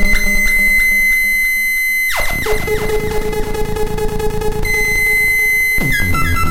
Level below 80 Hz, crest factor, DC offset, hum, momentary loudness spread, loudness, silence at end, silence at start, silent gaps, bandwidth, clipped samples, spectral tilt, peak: -22 dBFS; 12 dB; 5%; none; 10 LU; -13 LUFS; 0 s; 0 s; none; 16.5 kHz; under 0.1%; -3.5 dB/octave; 0 dBFS